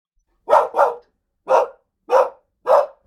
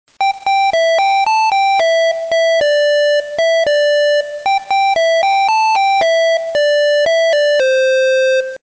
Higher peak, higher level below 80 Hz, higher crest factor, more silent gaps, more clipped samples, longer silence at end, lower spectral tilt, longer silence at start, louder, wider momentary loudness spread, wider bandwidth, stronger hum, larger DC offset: first, -2 dBFS vs -10 dBFS; second, -66 dBFS vs -58 dBFS; first, 18 dB vs 2 dB; neither; neither; first, 0.2 s vs 0.05 s; first, -3 dB/octave vs 0 dB/octave; first, 0.5 s vs 0.2 s; second, -18 LUFS vs -13 LUFS; first, 11 LU vs 3 LU; first, 14.5 kHz vs 8 kHz; neither; neither